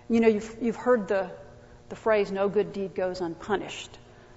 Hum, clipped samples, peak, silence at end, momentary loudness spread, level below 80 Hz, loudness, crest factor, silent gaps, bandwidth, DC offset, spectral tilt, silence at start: none; under 0.1%; -8 dBFS; 0.05 s; 14 LU; -58 dBFS; -27 LUFS; 20 dB; none; 8 kHz; under 0.1%; -6 dB/octave; 0.1 s